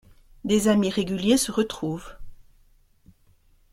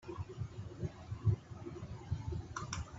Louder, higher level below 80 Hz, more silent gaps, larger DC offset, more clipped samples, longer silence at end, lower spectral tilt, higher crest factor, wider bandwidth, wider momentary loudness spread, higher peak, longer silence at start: first, -24 LUFS vs -42 LUFS; about the same, -50 dBFS vs -54 dBFS; neither; neither; neither; first, 1.4 s vs 0 s; second, -4.5 dB/octave vs -6 dB/octave; about the same, 18 dB vs 20 dB; first, 15.5 kHz vs 8 kHz; first, 16 LU vs 11 LU; first, -8 dBFS vs -22 dBFS; first, 0.45 s vs 0 s